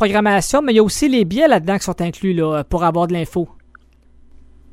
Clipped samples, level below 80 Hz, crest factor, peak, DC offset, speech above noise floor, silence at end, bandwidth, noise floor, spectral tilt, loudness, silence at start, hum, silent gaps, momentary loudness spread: under 0.1%; -38 dBFS; 16 dB; -2 dBFS; under 0.1%; 32 dB; 1.25 s; 16 kHz; -48 dBFS; -5 dB/octave; -16 LUFS; 0 s; none; none; 8 LU